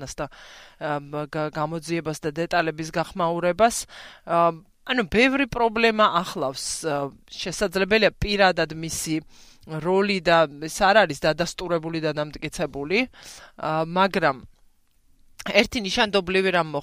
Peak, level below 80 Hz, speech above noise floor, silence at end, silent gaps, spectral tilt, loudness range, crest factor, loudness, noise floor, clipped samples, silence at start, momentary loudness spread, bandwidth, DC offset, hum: -2 dBFS; -48 dBFS; 36 dB; 0 s; none; -4 dB/octave; 4 LU; 22 dB; -23 LUFS; -59 dBFS; under 0.1%; 0 s; 12 LU; 15.5 kHz; under 0.1%; none